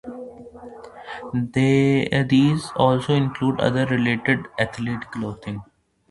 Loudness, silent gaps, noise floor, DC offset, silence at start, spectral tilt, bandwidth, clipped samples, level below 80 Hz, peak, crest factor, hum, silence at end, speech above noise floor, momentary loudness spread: -21 LUFS; none; -40 dBFS; under 0.1%; 0.05 s; -7 dB/octave; 11.5 kHz; under 0.1%; -52 dBFS; -4 dBFS; 18 dB; none; 0.5 s; 20 dB; 21 LU